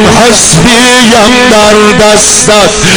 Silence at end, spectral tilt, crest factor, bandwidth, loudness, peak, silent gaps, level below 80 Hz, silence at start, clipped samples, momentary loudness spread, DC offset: 0 s; -2.5 dB/octave; 4 dB; over 20 kHz; -2 LUFS; 0 dBFS; none; -24 dBFS; 0 s; 10%; 1 LU; under 0.1%